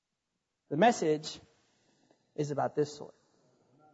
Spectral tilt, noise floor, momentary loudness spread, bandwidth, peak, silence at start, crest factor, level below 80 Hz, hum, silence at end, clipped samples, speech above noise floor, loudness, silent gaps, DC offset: -5 dB/octave; -85 dBFS; 22 LU; 8 kHz; -14 dBFS; 0.7 s; 20 dB; -78 dBFS; none; 0.85 s; under 0.1%; 55 dB; -31 LUFS; none; under 0.1%